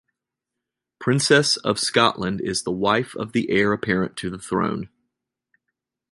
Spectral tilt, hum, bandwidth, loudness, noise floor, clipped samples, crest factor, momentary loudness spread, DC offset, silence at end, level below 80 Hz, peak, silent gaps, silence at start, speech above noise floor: -4 dB/octave; none; 11.5 kHz; -21 LUFS; -84 dBFS; under 0.1%; 20 dB; 11 LU; under 0.1%; 1.25 s; -54 dBFS; -2 dBFS; none; 1 s; 63 dB